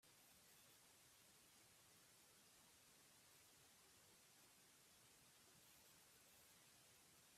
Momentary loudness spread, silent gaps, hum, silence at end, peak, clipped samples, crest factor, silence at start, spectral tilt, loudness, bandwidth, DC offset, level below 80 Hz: 1 LU; none; none; 0 s; -58 dBFS; under 0.1%; 14 dB; 0 s; -1.5 dB/octave; -69 LUFS; 15.5 kHz; under 0.1%; under -90 dBFS